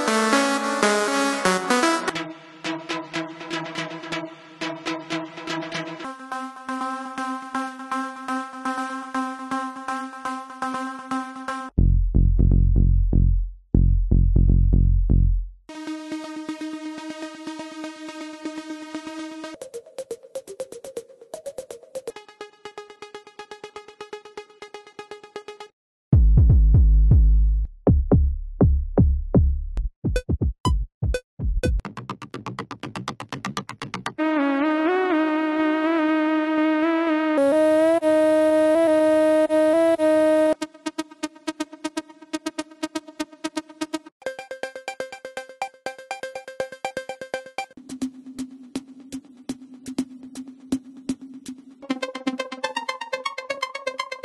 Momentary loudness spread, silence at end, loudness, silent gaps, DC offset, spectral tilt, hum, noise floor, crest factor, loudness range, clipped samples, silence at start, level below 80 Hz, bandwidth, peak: 20 LU; 0.05 s; -24 LUFS; 25.73-26.11 s, 29.96-30.02 s, 30.60-30.64 s, 30.94-31.01 s, 31.24-31.37 s, 44.12-44.20 s; under 0.1%; -6 dB/octave; none; -43 dBFS; 20 dB; 16 LU; under 0.1%; 0 s; -26 dBFS; 12 kHz; -4 dBFS